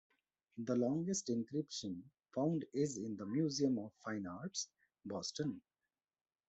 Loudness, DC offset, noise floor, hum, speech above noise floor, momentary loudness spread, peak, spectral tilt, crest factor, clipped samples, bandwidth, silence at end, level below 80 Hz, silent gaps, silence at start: -40 LUFS; under 0.1%; under -90 dBFS; none; over 50 dB; 11 LU; -24 dBFS; -5 dB/octave; 18 dB; under 0.1%; 8.2 kHz; 0.9 s; -80 dBFS; none; 0.55 s